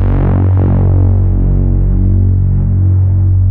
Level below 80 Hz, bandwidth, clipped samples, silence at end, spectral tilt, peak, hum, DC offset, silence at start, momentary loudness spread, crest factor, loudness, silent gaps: -14 dBFS; 2.4 kHz; under 0.1%; 0 s; -14 dB/octave; -2 dBFS; none; under 0.1%; 0 s; 2 LU; 6 dB; -11 LUFS; none